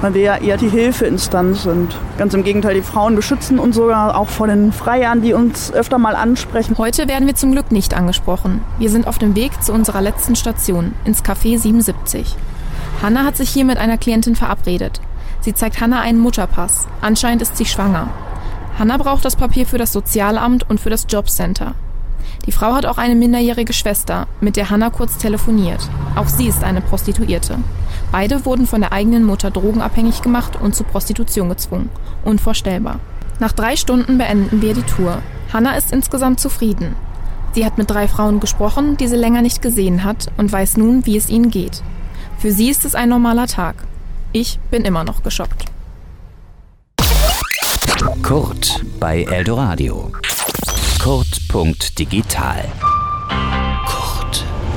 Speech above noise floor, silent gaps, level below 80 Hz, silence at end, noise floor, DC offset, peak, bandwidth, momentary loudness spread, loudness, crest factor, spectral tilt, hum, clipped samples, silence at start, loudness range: 27 dB; none; -22 dBFS; 0 s; -41 dBFS; under 0.1%; -2 dBFS; 17 kHz; 9 LU; -16 LUFS; 14 dB; -4.5 dB/octave; none; under 0.1%; 0 s; 3 LU